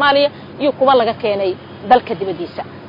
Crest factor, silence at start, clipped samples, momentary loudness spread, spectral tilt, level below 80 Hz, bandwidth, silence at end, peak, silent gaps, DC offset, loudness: 16 dB; 0 s; under 0.1%; 12 LU; -7.5 dB/octave; -56 dBFS; 6 kHz; 0 s; 0 dBFS; none; under 0.1%; -16 LUFS